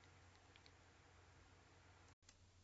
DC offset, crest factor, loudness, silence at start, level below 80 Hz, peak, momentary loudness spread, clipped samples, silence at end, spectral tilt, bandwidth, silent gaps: under 0.1%; 22 dB; -68 LUFS; 0 s; -78 dBFS; -46 dBFS; 2 LU; under 0.1%; 0 s; -3.5 dB/octave; 7.6 kHz; 2.13-2.22 s